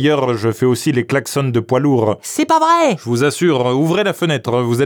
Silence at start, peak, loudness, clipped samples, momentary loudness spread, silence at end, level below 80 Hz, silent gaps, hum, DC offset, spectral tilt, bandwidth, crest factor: 0 s; -4 dBFS; -15 LUFS; under 0.1%; 5 LU; 0 s; -62 dBFS; none; none; under 0.1%; -5.5 dB/octave; over 20 kHz; 12 dB